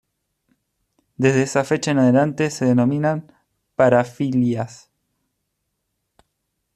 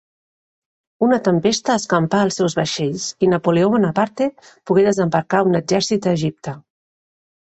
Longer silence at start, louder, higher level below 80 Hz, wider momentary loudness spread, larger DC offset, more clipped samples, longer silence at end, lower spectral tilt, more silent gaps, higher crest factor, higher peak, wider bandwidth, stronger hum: first, 1.2 s vs 1 s; about the same, -19 LUFS vs -18 LUFS; second, -62 dBFS vs -56 dBFS; about the same, 9 LU vs 7 LU; neither; neither; first, 2 s vs 0.85 s; about the same, -6.5 dB/octave vs -5.5 dB/octave; neither; about the same, 18 dB vs 16 dB; about the same, -2 dBFS vs -2 dBFS; first, 12 kHz vs 8.4 kHz; neither